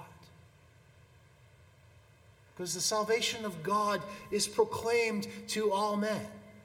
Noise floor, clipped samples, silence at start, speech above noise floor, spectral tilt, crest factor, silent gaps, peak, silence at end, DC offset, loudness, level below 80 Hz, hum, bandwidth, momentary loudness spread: -61 dBFS; under 0.1%; 0 s; 29 dB; -3 dB/octave; 20 dB; none; -14 dBFS; 0 s; under 0.1%; -32 LUFS; -68 dBFS; none; 18.5 kHz; 9 LU